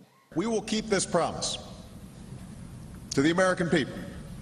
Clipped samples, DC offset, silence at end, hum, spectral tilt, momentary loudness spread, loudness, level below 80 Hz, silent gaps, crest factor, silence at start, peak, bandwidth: under 0.1%; under 0.1%; 0 s; none; -4.5 dB/octave; 21 LU; -28 LUFS; -52 dBFS; none; 18 dB; 0 s; -10 dBFS; 13.5 kHz